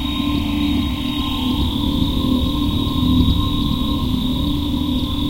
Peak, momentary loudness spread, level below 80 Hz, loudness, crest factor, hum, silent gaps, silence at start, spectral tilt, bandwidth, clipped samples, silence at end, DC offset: -2 dBFS; 4 LU; -24 dBFS; -19 LUFS; 16 dB; none; none; 0 s; -6.5 dB/octave; 16 kHz; under 0.1%; 0 s; 0.3%